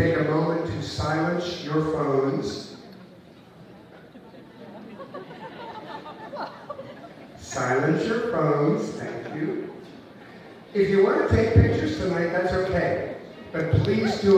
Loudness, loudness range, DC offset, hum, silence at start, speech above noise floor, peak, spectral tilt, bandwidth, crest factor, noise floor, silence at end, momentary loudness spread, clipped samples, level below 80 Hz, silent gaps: -24 LUFS; 17 LU; under 0.1%; none; 0 s; 26 dB; -4 dBFS; -7 dB/octave; 10 kHz; 20 dB; -48 dBFS; 0 s; 23 LU; under 0.1%; -44 dBFS; none